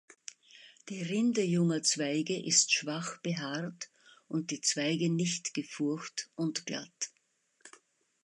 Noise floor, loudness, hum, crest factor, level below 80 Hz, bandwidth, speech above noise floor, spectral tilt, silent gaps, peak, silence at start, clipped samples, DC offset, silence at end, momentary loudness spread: -74 dBFS; -32 LUFS; none; 22 dB; -82 dBFS; 11.5 kHz; 42 dB; -3.5 dB/octave; none; -12 dBFS; 0.55 s; under 0.1%; under 0.1%; 0.55 s; 15 LU